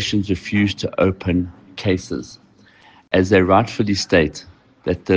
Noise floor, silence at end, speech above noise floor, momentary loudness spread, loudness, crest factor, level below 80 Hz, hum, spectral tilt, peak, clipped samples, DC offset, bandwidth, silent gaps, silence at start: -50 dBFS; 0 s; 32 dB; 14 LU; -19 LUFS; 18 dB; -46 dBFS; none; -6 dB/octave; -2 dBFS; under 0.1%; under 0.1%; 10 kHz; none; 0 s